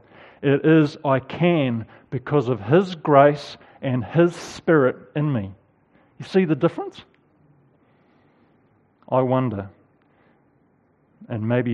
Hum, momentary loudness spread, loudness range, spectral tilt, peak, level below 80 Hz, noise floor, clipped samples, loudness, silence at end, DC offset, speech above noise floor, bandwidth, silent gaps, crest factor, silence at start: none; 16 LU; 9 LU; -8 dB/octave; 0 dBFS; -64 dBFS; -61 dBFS; under 0.1%; -21 LUFS; 0 s; under 0.1%; 41 dB; 10.5 kHz; none; 22 dB; 0.4 s